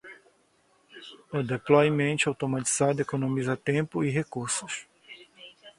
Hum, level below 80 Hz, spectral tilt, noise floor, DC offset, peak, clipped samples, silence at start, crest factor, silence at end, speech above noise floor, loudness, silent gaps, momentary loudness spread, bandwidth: none; -64 dBFS; -5 dB/octave; -66 dBFS; under 0.1%; -6 dBFS; under 0.1%; 0.05 s; 22 dB; 0.1 s; 39 dB; -27 LUFS; none; 24 LU; 11.5 kHz